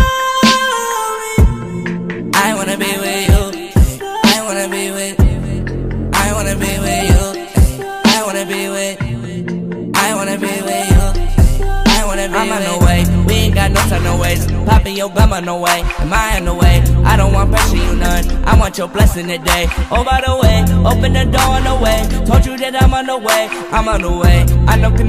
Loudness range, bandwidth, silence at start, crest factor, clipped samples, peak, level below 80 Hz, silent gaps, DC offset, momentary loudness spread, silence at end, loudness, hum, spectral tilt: 3 LU; 15.5 kHz; 0 s; 12 dB; under 0.1%; 0 dBFS; -16 dBFS; none; under 0.1%; 7 LU; 0 s; -14 LUFS; none; -5 dB/octave